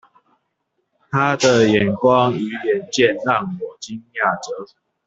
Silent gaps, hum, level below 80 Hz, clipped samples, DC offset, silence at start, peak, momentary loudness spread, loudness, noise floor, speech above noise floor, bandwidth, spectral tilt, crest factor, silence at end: none; none; -56 dBFS; under 0.1%; under 0.1%; 1.1 s; -2 dBFS; 15 LU; -18 LUFS; -72 dBFS; 54 dB; 8 kHz; -5 dB/octave; 16 dB; 0.4 s